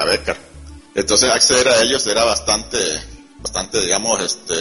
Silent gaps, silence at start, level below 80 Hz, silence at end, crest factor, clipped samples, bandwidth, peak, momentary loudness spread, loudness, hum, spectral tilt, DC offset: none; 0 s; -40 dBFS; 0 s; 18 dB; under 0.1%; 11.5 kHz; 0 dBFS; 14 LU; -16 LUFS; none; -1 dB/octave; under 0.1%